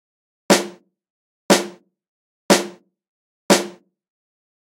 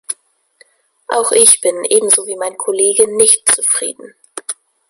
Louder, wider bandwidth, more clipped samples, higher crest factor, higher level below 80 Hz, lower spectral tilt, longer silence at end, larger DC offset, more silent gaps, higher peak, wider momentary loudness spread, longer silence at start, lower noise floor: second, -18 LUFS vs -11 LUFS; about the same, 16 kHz vs 16 kHz; second, under 0.1% vs 0.2%; first, 24 dB vs 16 dB; second, -68 dBFS vs -58 dBFS; first, -3 dB/octave vs 0 dB/octave; first, 1.1 s vs 0.35 s; neither; first, 1.10-1.49 s, 2.08-2.49 s, 3.08-3.49 s vs none; about the same, 0 dBFS vs 0 dBFS; about the same, 16 LU vs 18 LU; first, 0.5 s vs 0.1 s; second, -35 dBFS vs -52 dBFS